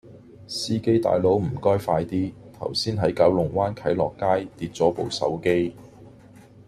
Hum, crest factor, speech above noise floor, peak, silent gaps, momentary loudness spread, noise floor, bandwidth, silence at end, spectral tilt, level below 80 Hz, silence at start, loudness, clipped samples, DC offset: none; 18 dB; 26 dB; -6 dBFS; none; 9 LU; -48 dBFS; 14 kHz; 0.6 s; -6 dB/octave; -54 dBFS; 0.05 s; -24 LUFS; under 0.1%; under 0.1%